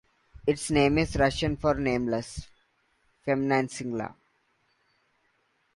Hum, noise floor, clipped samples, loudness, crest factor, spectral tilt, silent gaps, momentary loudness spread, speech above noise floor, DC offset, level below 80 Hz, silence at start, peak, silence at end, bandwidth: none; -71 dBFS; under 0.1%; -27 LUFS; 18 dB; -5.5 dB/octave; none; 13 LU; 45 dB; under 0.1%; -46 dBFS; 0.45 s; -10 dBFS; 1.65 s; 11.5 kHz